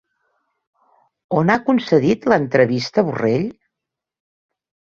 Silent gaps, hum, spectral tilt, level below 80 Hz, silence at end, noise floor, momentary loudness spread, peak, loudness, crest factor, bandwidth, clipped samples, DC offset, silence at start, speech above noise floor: none; none; -7 dB/octave; -58 dBFS; 1.35 s; -84 dBFS; 6 LU; -2 dBFS; -18 LUFS; 18 dB; 7.4 kHz; under 0.1%; under 0.1%; 1.3 s; 67 dB